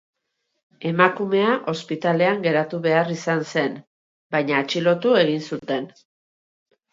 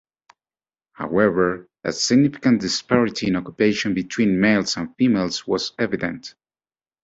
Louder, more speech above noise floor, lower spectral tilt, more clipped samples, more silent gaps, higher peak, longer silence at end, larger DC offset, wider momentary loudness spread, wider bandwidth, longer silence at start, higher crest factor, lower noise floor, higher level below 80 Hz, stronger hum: about the same, -21 LUFS vs -20 LUFS; second, 55 dB vs over 70 dB; about the same, -6 dB/octave vs -5 dB/octave; neither; first, 3.87-4.30 s vs none; about the same, -2 dBFS vs -2 dBFS; first, 1.05 s vs 0.75 s; neither; about the same, 10 LU vs 10 LU; about the same, 7.8 kHz vs 8 kHz; second, 0.8 s vs 1 s; about the same, 22 dB vs 18 dB; second, -76 dBFS vs under -90 dBFS; second, -72 dBFS vs -54 dBFS; neither